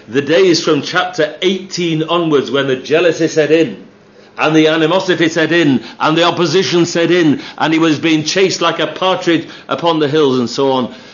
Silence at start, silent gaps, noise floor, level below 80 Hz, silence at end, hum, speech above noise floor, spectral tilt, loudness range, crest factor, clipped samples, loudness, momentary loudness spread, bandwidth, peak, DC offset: 0.1 s; none; -42 dBFS; -64 dBFS; 0.05 s; none; 29 dB; -4.5 dB/octave; 2 LU; 14 dB; under 0.1%; -13 LUFS; 6 LU; 7.4 kHz; 0 dBFS; under 0.1%